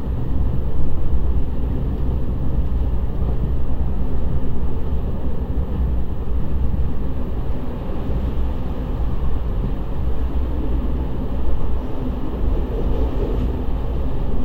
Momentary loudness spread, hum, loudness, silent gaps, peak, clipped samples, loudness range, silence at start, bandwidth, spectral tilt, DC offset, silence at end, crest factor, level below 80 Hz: 3 LU; none; -25 LUFS; none; -4 dBFS; under 0.1%; 2 LU; 0 s; 3.8 kHz; -10 dB/octave; under 0.1%; 0 s; 14 dB; -22 dBFS